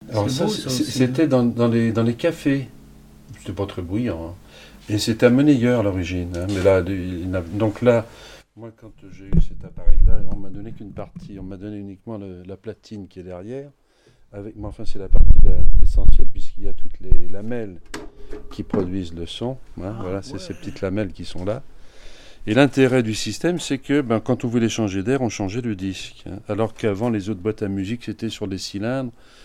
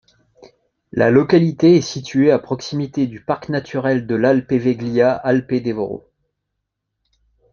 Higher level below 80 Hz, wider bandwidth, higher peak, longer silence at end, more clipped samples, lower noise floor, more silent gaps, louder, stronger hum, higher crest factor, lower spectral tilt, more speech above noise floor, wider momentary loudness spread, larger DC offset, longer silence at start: first, -24 dBFS vs -56 dBFS; first, 9.6 kHz vs 7.2 kHz; about the same, 0 dBFS vs 0 dBFS; second, 0.35 s vs 1.55 s; neither; second, -54 dBFS vs -77 dBFS; neither; second, -22 LUFS vs -17 LUFS; neither; about the same, 16 dB vs 18 dB; about the same, -6.5 dB/octave vs -7 dB/octave; second, 39 dB vs 60 dB; first, 18 LU vs 11 LU; neither; second, 0.1 s vs 0.95 s